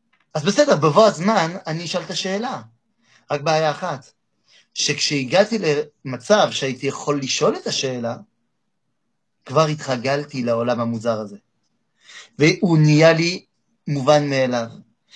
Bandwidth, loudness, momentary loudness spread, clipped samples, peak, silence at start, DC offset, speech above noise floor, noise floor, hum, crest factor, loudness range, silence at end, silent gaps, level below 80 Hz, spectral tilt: 10 kHz; -19 LUFS; 14 LU; under 0.1%; 0 dBFS; 0.35 s; under 0.1%; 57 dB; -76 dBFS; none; 20 dB; 5 LU; 0.35 s; none; -66 dBFS; -5 dB/octave